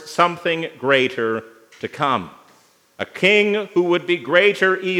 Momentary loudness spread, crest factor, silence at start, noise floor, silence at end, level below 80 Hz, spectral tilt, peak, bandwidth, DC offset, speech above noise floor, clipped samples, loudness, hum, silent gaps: 16 LU; 20 dB; 0 s; -55 dBFS; 0 s; -74 dBFS; -5 dB/octave; 0 dBFS; 14 kHz; under 0.1%; 36 dB; under 0.1%; -18 LUFS; none; none